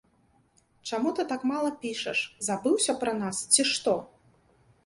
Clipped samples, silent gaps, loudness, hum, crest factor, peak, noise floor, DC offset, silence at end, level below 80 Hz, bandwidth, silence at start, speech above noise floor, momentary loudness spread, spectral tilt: under 0.1%; none; -27 LUFS; none; 24 dB; -6 dBFS; -66 dBFS; under 0.1%; 0.8 s; -70 dBFS; 11.5 kHz; 0.85 s; 38 dB; 10 LU; -2 dB/octave